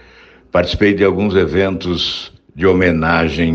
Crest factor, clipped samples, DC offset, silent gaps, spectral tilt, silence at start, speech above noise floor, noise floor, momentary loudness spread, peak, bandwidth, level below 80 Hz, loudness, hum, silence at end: 14 dB; under 0.1%; under 0.1%; none; -6.5 dB/octave; 0.55 s; 30 dB; -44 dBFS; 6 LU; 0 dBFS; 7.6 kHz; -34 dBFS; -15 LUFS; none; 0 s